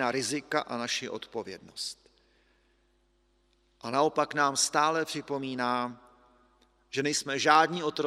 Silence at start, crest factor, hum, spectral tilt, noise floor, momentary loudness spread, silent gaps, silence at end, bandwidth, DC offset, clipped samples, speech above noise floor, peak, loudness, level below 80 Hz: 0 s; 24 dB; none; -2.5 dB/octave; -69 dBFS; 15 LU; none; 0 s; 15.5 kHz; under 0.1%; under 0.1%; 40 dB; -6 dBFS; -29 LUFS; -72 dBFS